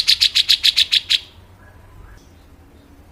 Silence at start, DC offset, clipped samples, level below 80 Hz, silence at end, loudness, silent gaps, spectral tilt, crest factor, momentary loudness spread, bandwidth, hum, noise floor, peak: 0 s; under 0.1%; under 0.1%; -48 dBFS; 1.9 s; -13 LUFS; none; 1.5 dB/octave; 20 dB; 6 LU; 16 kHz; none; -46 dBFS; -2 dBFS